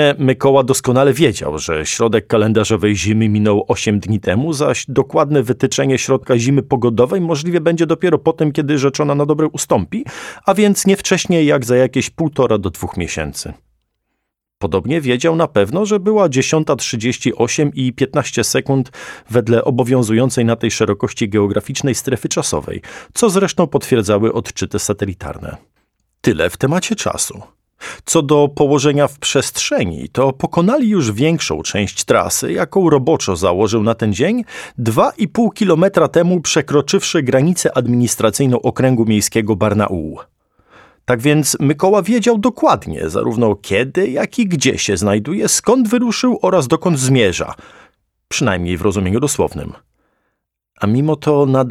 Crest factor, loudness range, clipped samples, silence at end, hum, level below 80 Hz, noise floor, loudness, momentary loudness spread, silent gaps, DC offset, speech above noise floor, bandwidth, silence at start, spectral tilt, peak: 14 dB; 4 LU; under 0.1%; 0 s; none; -44 dBFS; -74 dBFS; -15 LUFS; 7 LU; none; under 0.1%; 59 dB; 16 kHz; 0 s; -5 dB/octave; 0 dBFS